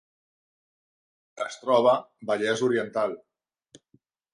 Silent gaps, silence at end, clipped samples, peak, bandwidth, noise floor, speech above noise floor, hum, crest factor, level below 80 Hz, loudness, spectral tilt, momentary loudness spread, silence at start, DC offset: none; 1.15 s; under 0.1%; -8 dBFS; 11 kHz; -67 dBFS; 42 dB; none; 22 dB; -76 dBFS; -26 LUFS; -4.5 dB/octave; 14 LU; 1.35 s; under 0.1%